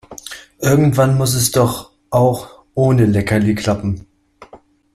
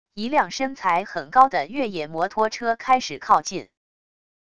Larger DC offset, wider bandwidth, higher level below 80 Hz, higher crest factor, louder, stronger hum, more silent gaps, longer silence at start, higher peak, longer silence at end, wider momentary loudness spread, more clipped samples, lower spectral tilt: second, under 0.1% vs 0.5%; first, 15.5 kHz vs 9.8 kHz; first, -44 dBFS vs -60 dBFS; about the same, 16 dB vs 20 dB; first, -16 LUFS vs -22 LUFS; neither; neither; about the same, 0.1 s vs 0.15 s; about the same, -2 dBFS vs -2 dBFS; second, 0.4 s vs 0.8 s; first, 15 LU vs 9 LU; neither; first, -6 dB/octave vs -3.5 dB/octave